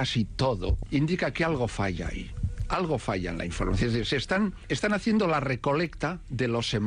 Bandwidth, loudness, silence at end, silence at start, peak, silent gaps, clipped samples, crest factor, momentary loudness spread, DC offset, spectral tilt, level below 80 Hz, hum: 11 kHz; -28 LUFS; 0 s; 0 s; -16 dBFS; none; under 0.1%; 12 dB; 7 LU; under 0.1%; -6 dB/octave; -38 dBFS; none